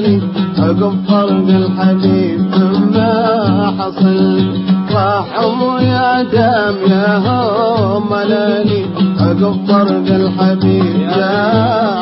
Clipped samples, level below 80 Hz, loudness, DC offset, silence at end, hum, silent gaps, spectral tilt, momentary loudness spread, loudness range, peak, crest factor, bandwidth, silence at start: under 0.1%; -44 dBFS; -12 LUFS; under 0.1%; 0 s; none; none; -12 dB/octave; 3 LU; 1 LU; 0 dBFS; 12 dB; 5.8 kHz; 0 s